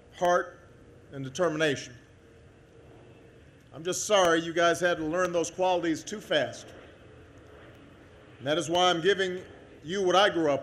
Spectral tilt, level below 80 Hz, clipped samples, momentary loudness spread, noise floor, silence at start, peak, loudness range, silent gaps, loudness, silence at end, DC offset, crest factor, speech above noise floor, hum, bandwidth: -3.5 dB/octave; -62 dBFS; under 0.1%; 18 LU; -54 dBFS; 0.15 s; -10 dBFS; 6 LU; none; -27 LUFS; 0 s; under 0.1%; 20 dB; 28 dB; none; 13 kHz